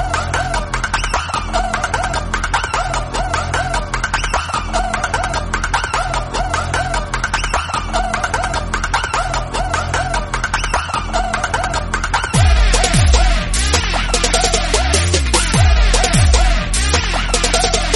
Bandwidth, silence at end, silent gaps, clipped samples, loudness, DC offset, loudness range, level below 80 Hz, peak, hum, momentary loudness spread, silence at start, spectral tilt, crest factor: 11.5 kHz; 0 s; none; under 0.1%; -16 LUFS; under 0.1%; 5 LU; -20 dBFS; 0 dBFS; none; 6 LU; 0 s; -3.5 dB/octave; 16 dB